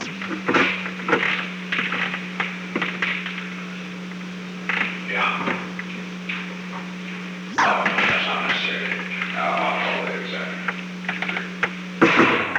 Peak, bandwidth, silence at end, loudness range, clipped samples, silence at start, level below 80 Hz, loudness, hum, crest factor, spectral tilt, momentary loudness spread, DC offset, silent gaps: -2 dBFS; 10.5 kHz; 0 s; 5 LU; under 0.1%; 0 s; -64 dBFS; -23 LUFS; none; 22 dB; -4.5 dB/octave; 13 LU; under 0.1%; none